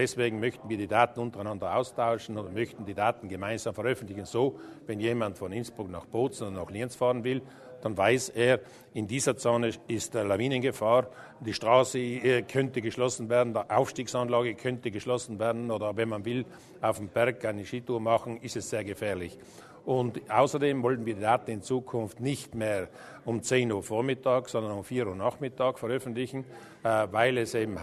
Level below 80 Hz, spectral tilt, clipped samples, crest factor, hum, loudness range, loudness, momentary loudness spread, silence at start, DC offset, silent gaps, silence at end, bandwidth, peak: -64 dBFS; -5 dB/octave; under 0.1%; 22 dB; none; 4 LU; -30 LUFS; 10 LU; 0 s; under 0.1%; none; 0 s; 13.5 kHz; -8 dBFS